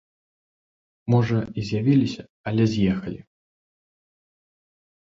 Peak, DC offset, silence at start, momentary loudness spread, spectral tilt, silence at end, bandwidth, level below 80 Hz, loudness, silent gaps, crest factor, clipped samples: -6 dBFS; under 0.1%; 1.05 s; 15 LU; -8 dB/octave; 1.85 s; 7.6 kHz; -52 dBFS; -23 LUFS; 2.30-2.44 s; 20 dB; under 0.1%